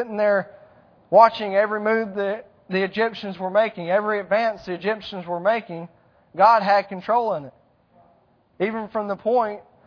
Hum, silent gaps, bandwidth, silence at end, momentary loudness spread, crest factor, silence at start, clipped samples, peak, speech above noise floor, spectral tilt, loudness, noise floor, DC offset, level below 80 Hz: none; none; 5.4 kHz; 0.25 s; 13 LU; 22 dB; 0 s; under 0.1%; 0 dBFS; 39 dB; -7 dB/octave; -22 LUFS; -60 dBFS; under 0.1%; -66 dBFS